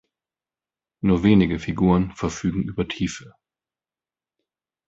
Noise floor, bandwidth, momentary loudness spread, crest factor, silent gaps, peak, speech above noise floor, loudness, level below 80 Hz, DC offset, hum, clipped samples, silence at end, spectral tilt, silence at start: under -90 dBFS; 7.8 kHz; 10 LU; 20 dB; none; -4 dBFS; over 69 dB; -22 LUFS; -42 dBFS; under 0.1%; none; under 0.1%; 1.6 s; -7 dB/octave; 1.05 s